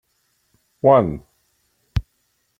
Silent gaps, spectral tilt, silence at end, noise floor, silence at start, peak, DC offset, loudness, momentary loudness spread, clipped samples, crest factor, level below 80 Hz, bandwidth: none; -9 dB/octave; 0.6 s; -68 dBFS; 0.85 s; -2 dBFS; under 0.1%; -19 LUFS; 13 LU; under 0.1%; 20 dB; -40 dBFS; 7.4 kHz